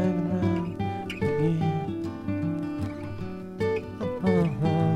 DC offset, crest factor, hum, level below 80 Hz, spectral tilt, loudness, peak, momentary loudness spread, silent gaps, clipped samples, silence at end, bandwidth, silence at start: under 0.1%; 16 dB; none; -52 dBFS; -8.5 dB/octave; -28 LUFS; -12 dBFS; 9 LU; none; under 0.1%; 0 s; 10.5 kHz; 0 s